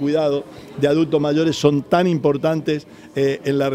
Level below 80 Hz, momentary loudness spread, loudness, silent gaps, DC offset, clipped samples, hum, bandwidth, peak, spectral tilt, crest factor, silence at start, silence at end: -56 dBFS; 9 LU; -19 LUFS; none; under 0.1%; under 0.1%; none; 15 kHz; 0 dBFS; -6.5 dB/octave; 18 dB; 0 s; 0 s